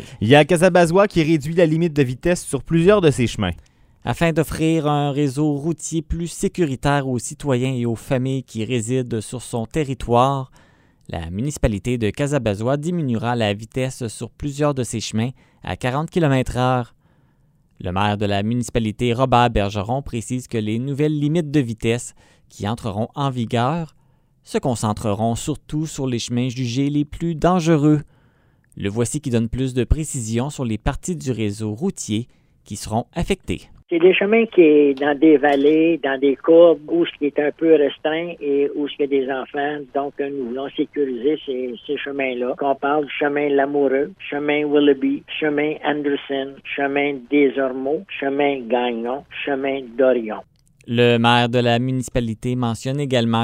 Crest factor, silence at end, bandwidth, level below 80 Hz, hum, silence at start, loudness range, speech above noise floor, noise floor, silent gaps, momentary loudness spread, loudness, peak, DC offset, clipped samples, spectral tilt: 20 dB; 0 s; 16 kHz; -40 dBFS; none; 0 s; 7 LU; 39 dB; -58 dBFS; none; 11 LU; -20 LUFS; 0 dBFS; under 0.1%; under 0.1%; -6 dB/octave